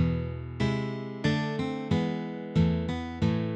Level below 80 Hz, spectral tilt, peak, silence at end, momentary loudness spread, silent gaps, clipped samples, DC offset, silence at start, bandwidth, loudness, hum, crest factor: -44 dBFS; -7.5 dB/octave; -14 dBFS; 0 s; 6 LU; none; under 0.1%; under 0.1%; 0 s; 8.2 kHz; -30 LUFS; none; 16 dB